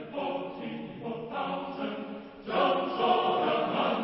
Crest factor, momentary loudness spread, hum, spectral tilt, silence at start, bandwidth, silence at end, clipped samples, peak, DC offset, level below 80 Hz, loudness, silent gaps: 18 dB; 13 LU; none; -9 dB/octave; 0 s; 5.8 kHz; 0 s; under 0.1%; -14 dBFS; under 0.1%; -68 dBFS; -30 LUFS; none